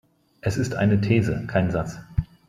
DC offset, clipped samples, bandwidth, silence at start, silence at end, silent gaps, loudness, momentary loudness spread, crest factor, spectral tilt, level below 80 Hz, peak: under 0.1%; under 0.1%; 12.5 kHz; 0.45 s; 0.25 s; none; -24 LUFS; 9 LU; 16 dB; -7.5 dB/octave; -42 dBFS; -6 dBFS